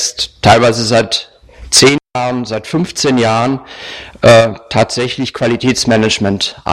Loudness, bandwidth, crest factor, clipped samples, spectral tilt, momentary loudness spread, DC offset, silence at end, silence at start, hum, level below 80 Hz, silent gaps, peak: -12 LUFS; 16 kHz; 12 dB; 0.1%; -4 dB/octave; 10 LU; under 0.1%; 0 s; 0 s; none; -40 dBFS; none; 0 dBFS